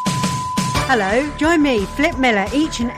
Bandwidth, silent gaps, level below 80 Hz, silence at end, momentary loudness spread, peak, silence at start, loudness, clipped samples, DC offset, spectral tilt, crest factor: 15.5 kHz; none; -36 dBFS; 0 s; 4 LU; -6 dBFS; 0 s; -17 LUFS; under 0.1%; under 0.1%; -4.5 dB/octave; 12 dB